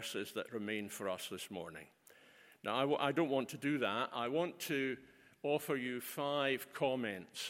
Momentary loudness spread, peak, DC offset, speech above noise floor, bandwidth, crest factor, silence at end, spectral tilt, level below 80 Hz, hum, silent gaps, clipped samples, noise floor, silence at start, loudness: 10 LU; -18 dBFS; under 0.1%; 25 dB; 16.5 kHz; 20 dB; 0 s; -4.5 dB/octave; -84 dBFS; none; none; under 0.1%; -64 dBFS; 0 s; -38 LUFS